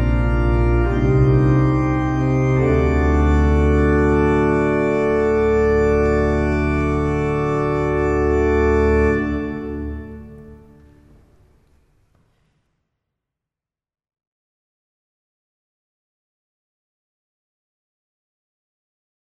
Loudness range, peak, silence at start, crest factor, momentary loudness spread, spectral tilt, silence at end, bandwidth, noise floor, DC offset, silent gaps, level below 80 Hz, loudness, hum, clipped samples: 8 LU; -4 dBFS; 0 s; 16 dB; 5 LU; -9 dB/octave; 8.75 s; 8.4 kHz; -89 dBFS; under 0.1%; none; -26 dBFS; -17 LUFS; none; under 0.1%